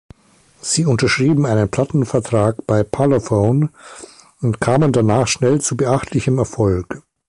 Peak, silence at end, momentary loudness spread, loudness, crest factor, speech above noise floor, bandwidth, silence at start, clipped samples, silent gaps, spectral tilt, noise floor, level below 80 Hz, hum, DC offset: -2 dBFS; 0.3 s; 9 LU; -17 LUFS; 14 dB; 37 dB; 11.5 kHz; 0.65 s; under 0.1%; none; -5.5 dB/octave; -53 dBFS; -42 dBFS; none; under 0.1%